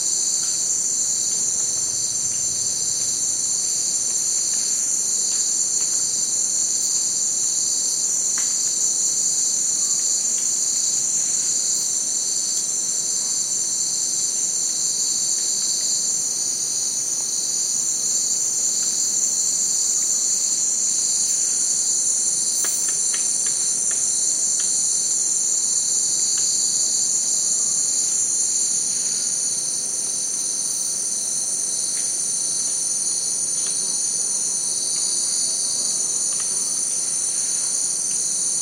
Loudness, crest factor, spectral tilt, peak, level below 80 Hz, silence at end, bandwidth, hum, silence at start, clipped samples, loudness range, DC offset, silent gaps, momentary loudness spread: -18 LUFS; 16 dB; 1.5 dB/octave; -6 dBFS; -70 dBFS; 0 s; 16 kHz; none; 0 s; under 0.1%; 2 LU; under 0.1%; none; 3 LU